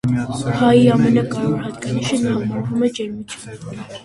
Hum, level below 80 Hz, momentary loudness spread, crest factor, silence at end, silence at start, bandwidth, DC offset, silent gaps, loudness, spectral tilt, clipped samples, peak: none; -48 dBFS; 19 LU; 16 dB; 0 s; 0.05 s; 11.5 kHz; under 0.1%; none; -18 LUFS; -6.5 dB/octave; under 0.1%; -2 dBFS